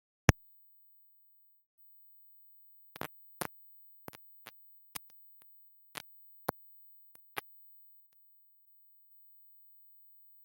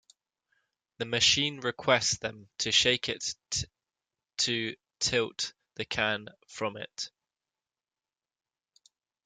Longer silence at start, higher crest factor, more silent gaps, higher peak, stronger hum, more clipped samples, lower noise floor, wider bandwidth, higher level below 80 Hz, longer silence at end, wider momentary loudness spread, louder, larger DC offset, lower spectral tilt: second, 0.3 s vs 1 s; first, 40 dB vs 24 dB; first, 1.66-1.78 s vs none; first, -4 dBFS vs -8 dBFS; first, 50 Hz at -80 dBFS vs none; neither; second, -66 dBFS vs under -90 dBFS; first, 16.5 kHz vs 11 kHz; first, -54 dBFS vs -62 dBFS; first, 3.05 s vs 2.2 s; first, 19 LU vs 16 LU; second, -41 LUFS vs -29 LUFS; neither; first, -5 dB/octave vs -1.5 dB/octave